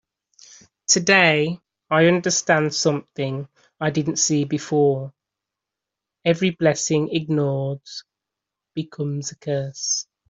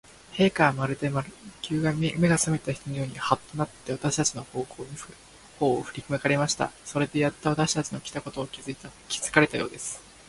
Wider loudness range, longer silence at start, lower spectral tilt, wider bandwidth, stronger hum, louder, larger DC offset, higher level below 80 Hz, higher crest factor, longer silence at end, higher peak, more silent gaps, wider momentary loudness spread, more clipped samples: about the same, 5 LU vs 3 LU; first, 0.9 s vs 0.3 s; about the same, -4 dB/octave vs -4.5 dB/octave; second, 8 kHz vs 11.5 kHz; neither; first, -20 LUFS vs -27 LUFS; neither; second, -64 dBFS vs -56 dBFS; second, 20 dB vs 26 dB; about the same, 0.25 s vs 0.2 s; about the same, -2 dBFS vs -2 dBFS; neither; about the same, 15 LU vs 15 LU; neither